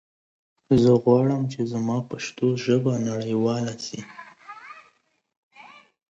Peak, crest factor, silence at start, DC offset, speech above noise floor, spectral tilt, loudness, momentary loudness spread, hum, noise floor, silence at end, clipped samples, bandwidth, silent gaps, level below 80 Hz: -4 dBFS; 20 dB; 0.7 s; under 0.1%; 44 dB; -7 dB/octave; -23 LUFS; 24 LU; none; -66 dBFS; 0.5 s; under 0.1%; 8 kHz; 5.37-5.51 s; -58 dBFS